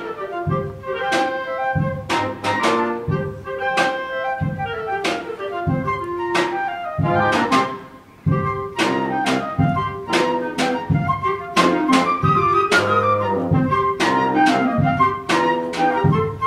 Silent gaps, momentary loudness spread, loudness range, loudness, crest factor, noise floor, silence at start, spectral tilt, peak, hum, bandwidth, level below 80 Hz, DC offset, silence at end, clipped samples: none; 8 LU; 5 LU; -20 LUFS; 18 dB; -39 dBFS; 0 s; -5.5 dB/octave; -2 dBFS; none; 15 kHz; -46 dBFS; under 0.1%; 0 s; under 0.1%